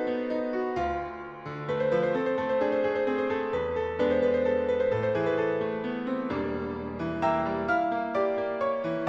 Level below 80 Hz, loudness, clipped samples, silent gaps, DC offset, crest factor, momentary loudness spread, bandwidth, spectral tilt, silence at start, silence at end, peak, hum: -54 dBFS; -28 LUFS; under 0.1%; none; under 0.1%; 14 dB; 7 LU; 7.2 kHz; -7.5 dB/octave; 0 s; 0 s; -12 dBFS; none